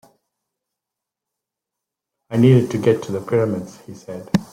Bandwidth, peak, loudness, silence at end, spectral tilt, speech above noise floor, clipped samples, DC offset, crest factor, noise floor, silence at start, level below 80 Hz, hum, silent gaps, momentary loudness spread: 15 kHz; -2 dBFS; -18 LUFS; 0.1 s; -8 dB/octave; 67 dB; under 0.1%; under 0.1%; 20 dB; -85 dBFS; 2.3 s; -54 dBFS; none; none; 20 LU